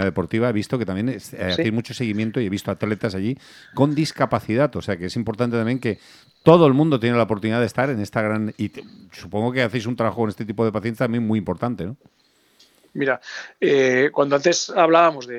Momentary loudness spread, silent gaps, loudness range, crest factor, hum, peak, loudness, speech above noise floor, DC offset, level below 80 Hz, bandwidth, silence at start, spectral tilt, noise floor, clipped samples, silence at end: 11 LU; none; 5 LU; 20 dB; none; 0 dBFS; -21 LUFS; 36 dB; under 0.1%; -56 dBFS; 14.5 kHz; 0 s; -6 dB/octave; -57 dBFS; under 0.1%; 0 s